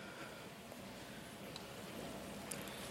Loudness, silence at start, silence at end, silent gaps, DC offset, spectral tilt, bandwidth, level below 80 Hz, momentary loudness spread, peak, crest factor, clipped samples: -49 LUFS; 0 s; 0 s; none; under 0.1%; -3.5 dB/octave; 16 kHz; -68 dBFS; 6 LU; -22 dBFS; 28 dB; under 0.1%